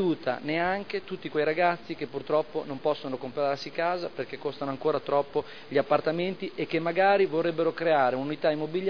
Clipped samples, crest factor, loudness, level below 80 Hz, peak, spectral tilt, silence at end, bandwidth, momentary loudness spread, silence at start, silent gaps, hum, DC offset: under 0.1%; 18 dB; -28 LUFS; -70 dBFS; -8 dBFS; -7 dB/octave; 0 s; 5.4 kHz; 10 LU; 0 s; none; none; 0.4%